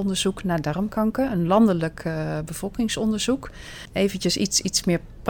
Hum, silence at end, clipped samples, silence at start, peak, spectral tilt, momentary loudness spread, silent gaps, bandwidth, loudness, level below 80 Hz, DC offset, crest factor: none; 0 s; under 0.1%; 0 s; -6 dBFS; -4.5 dB/octave; 9 LU; none; 19 kHz; -23 LUFS; -44 dBFS; under 0.1%; 18 dB